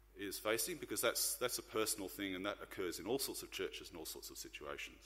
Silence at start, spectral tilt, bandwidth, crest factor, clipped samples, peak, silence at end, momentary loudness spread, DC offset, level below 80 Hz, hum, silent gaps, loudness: 0.05 s; -2 dB/octave; 16 kHz; 22 dB; under 0.1%; -20 dBFS; 0 s; 11 LU; under 0.1%; -66 dBFS; none; none; -41 LUFS